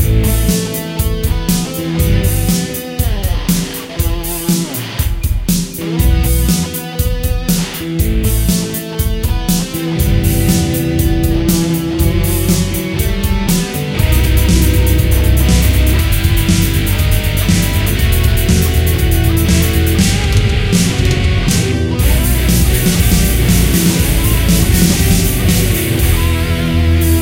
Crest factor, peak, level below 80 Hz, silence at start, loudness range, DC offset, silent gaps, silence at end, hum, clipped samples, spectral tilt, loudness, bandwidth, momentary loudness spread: 12 dB; 0 dBFS; -16 dBFS; 0 s; 4 LU; under 0.1%; none; 0 s; none; under 0.1%; -5 dB/octave; -13 LUFS; 17.5 kHz; 6 LU